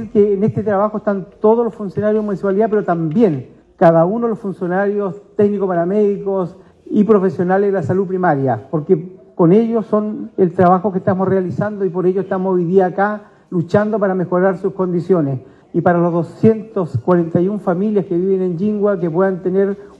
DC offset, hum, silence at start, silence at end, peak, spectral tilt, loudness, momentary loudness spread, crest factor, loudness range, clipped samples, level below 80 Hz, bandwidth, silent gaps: under 0.1%; none; 0 s; 0.15 s; 0 dBFS; -10 dB/octave; -16 LUFS; 7 LU; 14 dB; 1 LU; under 0.1%; -56 dBFS; 7.2 kHz; none